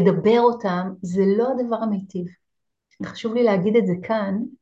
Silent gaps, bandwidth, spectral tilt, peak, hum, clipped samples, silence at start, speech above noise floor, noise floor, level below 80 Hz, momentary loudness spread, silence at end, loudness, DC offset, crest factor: none; 7.8 kHz; -8 dB/octave; -4 dBFS; none; under 0.1%; 0 s; 60 dB; -80 dBFS; -64 dBFS; 15 LU; 0.05 s; -21 LUFS; under 0.1%; 18 dB